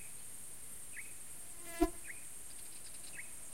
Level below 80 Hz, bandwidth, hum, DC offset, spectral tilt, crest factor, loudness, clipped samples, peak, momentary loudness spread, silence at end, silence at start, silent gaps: -54 dBFS; 16 kHz; none; 0.4%; -3 dB/octave; 26 dB; -44 LUFS; under 0.1%; -18 dBFS; 11 LU; 0 s; 0 s; none